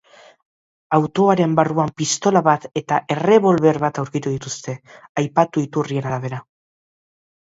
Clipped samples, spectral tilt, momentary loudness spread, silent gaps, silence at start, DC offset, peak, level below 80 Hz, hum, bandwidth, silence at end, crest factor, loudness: under 0.1%; -5.5 dB/octave; 13 LU; 5.09-5.15 s; 0.9 s; under 0.1%; 0 dBFS; -60 dBFS; none; 8 kHz; 1.05 s; 20 dB; -19 LUFS